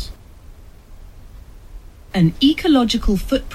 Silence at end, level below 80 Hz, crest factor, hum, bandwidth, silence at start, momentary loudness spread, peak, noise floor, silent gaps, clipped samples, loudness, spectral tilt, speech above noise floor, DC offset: 0 s; -30 dBFS; 16 dB; none; 15 kHz; 0 s; 9 LU; -4 dBFS; -40 dBFS; none; under 0.1%; -17 LUFS; -6 dB/octave; 24 dB; under 0.1%